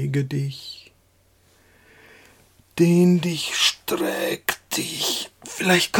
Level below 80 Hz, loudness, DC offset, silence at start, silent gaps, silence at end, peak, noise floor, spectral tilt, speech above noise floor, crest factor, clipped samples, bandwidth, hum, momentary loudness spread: -62 dBFS; -22 LUFS; under 0.1%; 0 s; none; 0 s; -4 dBFS; -60 dBFS; -4 dB/octave; 39 dB; 20 dB; under 0.1%; 17.5 kHz; none; 16 LU